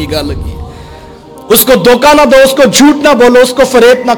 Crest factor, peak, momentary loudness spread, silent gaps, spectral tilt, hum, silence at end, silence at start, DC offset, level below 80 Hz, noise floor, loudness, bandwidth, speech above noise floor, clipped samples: 6 dB; 0 dBFS; 16 LU; none; -3.5 dB/octave; none; 0 s; 0 s; under 0.1%; -28 dBFS; -30 dBFS; -5 LUFS; over 20 kHz; 24 dB; 0.2%